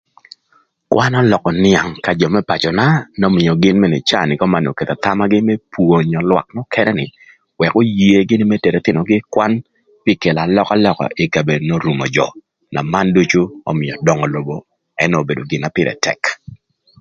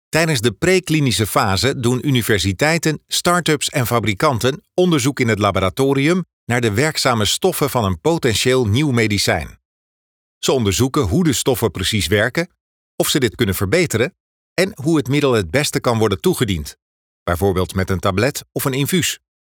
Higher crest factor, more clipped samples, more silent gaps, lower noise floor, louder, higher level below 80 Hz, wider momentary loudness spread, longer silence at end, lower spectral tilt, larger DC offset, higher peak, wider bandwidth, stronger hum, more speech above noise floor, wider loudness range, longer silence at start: about the same, 14 dB vs 16 dB; neither; second, none vs 6.33-6.47 s, 9.65-10.41 s, 12.60-12.98 s, 14.20-14.56 s, 16.82-17.26 s; second, -57 dBFS vs under -90 dBFS; about the same, -15 LUFS vs -17 LUFS; about the same, -46 dBFS vs -44 dBFS; first, 8 LU vs 5 LU; first, 0.45 s vs 0.3 s; first, -6 dB/octave vs -4.5 dB/octave; neither; about the same, 0 dBFS vs -2 dBFS; second, 7.6 kHz vs over 20 kHz; neither; second, 43 dB vs over 73 dB; about the same, 3 LU vs 2 LU; first, 0.9 s vs 0.15 s